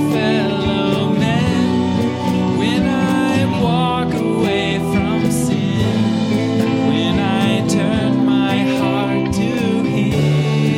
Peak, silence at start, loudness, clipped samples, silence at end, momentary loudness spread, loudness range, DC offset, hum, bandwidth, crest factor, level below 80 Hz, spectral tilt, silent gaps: -2 dBFS; 0 s; -16 LUFS; under 0.1%; 0 s; 2 LU; 1 LU; under 0.1%; none; 16 kHz; 12 dB; -40 dBFS; -6.5 dB/octave; none